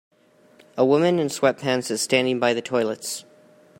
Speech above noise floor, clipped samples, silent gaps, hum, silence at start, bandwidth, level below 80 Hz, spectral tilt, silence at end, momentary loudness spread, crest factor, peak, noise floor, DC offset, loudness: 34 dB; under 0.1%; none; none; 0.75 s; 16 kHz; -70 dBFS; -4 dB/octave; 0.6 s; 11 LU; 20 dB; -4 dBFS; -55 dBFS; under 0.1%; -22 LUFS